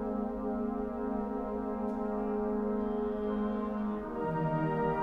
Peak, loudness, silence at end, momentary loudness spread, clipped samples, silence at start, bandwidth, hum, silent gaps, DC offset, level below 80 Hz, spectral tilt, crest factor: -20 dBFS; -34 LUFS; 0 s; 4 LU; under 0.1%; 0 s; 4.9 kHz; 60 Hz at -60 dBFS; none; under 0.1%; -52 dBFS; -10 dB/octave; 14 dB